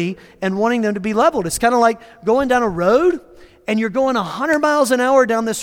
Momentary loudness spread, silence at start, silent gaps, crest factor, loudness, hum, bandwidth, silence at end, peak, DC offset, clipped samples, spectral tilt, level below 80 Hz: 9 LU; 0 s; none; 14 dB; -17 LUFS; none; 17.5 kHz; 0 s; -2 dBFS; under 0.1%; under 0.1%; -4.5 dB/octave; -48 dBFS